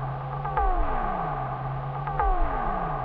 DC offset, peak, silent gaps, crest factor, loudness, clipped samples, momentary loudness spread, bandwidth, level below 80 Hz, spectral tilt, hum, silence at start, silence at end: under 0.1%; -10 dBFS; none; 16 dB; -29 LUFS; under 0.1%; 5 LU; 4.5 kHz; -30 dBFS; -10 dB/octave; none; 0 s; 0 s